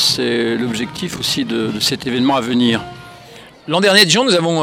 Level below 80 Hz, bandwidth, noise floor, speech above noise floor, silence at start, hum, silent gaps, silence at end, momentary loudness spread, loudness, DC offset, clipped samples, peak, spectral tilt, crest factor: -52 dBFS; 18 kHz; -39 dBFS; 24 dB; 0 s; none; none; 0 s; 12 LU; -15 LUFS; under 0.1%; under 0.1%; 0 dBFS; -3.5 dB/octave; 16 dB